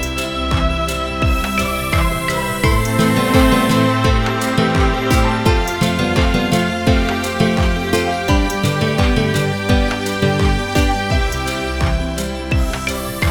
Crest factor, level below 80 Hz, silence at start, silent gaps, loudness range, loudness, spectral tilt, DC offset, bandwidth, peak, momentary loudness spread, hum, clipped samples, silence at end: 14 dB; -22 dBFS; 0 s; none; 3 LU; -17 LUFS; -5.5 dB/octave; 0.2%; 19.5 kHz; -2 dBFS; 5 LU; none; under 0.1%; 0 s